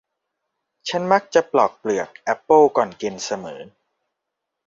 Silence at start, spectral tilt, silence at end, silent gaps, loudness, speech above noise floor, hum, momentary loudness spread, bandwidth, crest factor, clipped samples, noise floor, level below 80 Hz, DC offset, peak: 0.85 s; -4.5 dB/octave; 1 s; none; -20 LUFS; 62 dB; none; 15 LU; 7.6 kHz; 20 dB; under 0.1%; -81 dBFS; -66 dBFS; under 0.1%; -2 dBFS